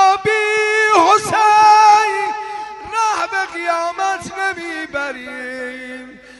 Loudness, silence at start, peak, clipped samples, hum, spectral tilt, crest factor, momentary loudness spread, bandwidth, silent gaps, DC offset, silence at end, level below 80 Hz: -15 LUFS; 0 s; 0 dBFS; under 0.1%; none; -2 dB/octave; 16 dB; 18 LU; 11.5 kHz; none; under 0.1%; 0.25 s; -56 dBFS